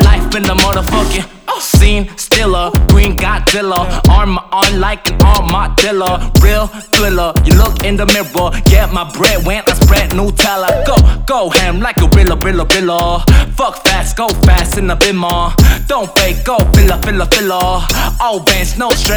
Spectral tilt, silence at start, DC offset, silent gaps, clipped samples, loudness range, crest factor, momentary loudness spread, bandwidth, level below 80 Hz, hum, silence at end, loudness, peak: -4.5 dB/octave; 0 s; under 0.1%; none; 0.3%; 1 LU; 10 dB; 5 LU; over 20 kHz; -12 dBFS; none; 0 s; -11 LUFS; 0 dBFS